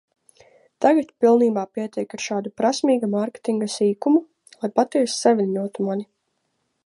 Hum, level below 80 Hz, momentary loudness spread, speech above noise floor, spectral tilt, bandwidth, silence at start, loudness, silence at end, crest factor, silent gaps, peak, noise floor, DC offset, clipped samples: none; -74 dBFS; 10 LU; 52 dB; -5 dB/octave; 11.5 kHz; 0.8 s; -21 LUFS; 0.8 s; 18 dB; none; -4 dBFS; -73 dBFS; under 0.1%; under 0.1%